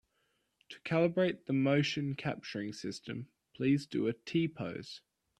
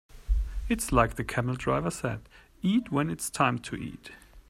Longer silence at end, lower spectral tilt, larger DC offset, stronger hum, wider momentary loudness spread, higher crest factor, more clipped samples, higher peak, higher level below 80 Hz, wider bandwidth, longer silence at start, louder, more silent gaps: first, 0.4 s vs 0.1 s; about the same, -6.5 dB/octave vs -5.5 dB/octave; neither; neither; first, 16 LU vs 13 LU; about the same, 18 dB vs 22 dB; neither; second, -16 dBFS vs -6 dBFS; second, -72 dBFS vs -38 dBFS; second, 11 kHz vs 15 kHz; first, 0.7 s vs 0.15 s; second, -34 LUFS vs -29 LUFS; neither